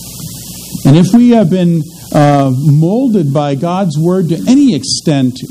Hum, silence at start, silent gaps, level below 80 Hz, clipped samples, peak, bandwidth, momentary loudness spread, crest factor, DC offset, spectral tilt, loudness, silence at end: none; 0 s; none; -44 dBFS; 0.7%; 0 dBFS; 16 kHz; 10 LU; 10 dB; under 0.1%; -6.5 dB/octave; -10 LUFS; 0 s